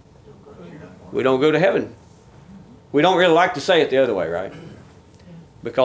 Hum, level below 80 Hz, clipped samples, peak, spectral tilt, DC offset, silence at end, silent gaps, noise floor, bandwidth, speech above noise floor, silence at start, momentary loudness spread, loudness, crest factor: none; -56 dBFS; under 0.1%; -2 dBFS; -5.5 dB/octave; under 0.1%; 0 s; none; -46 dBFS; 8 kHz; 28 dB; 0.45 s; 25 LU; -18 LUFS; 18 dB